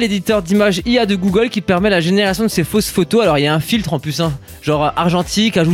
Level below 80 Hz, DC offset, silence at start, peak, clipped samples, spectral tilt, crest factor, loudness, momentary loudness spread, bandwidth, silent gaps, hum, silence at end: -38 dBFS; under 0.1%; 0 s; -2 dBFS; under 0.1%; -5 dB/octave; 12 dB; -15 LUFS; 5 LU; 16.5 kHz; none; none; 0 s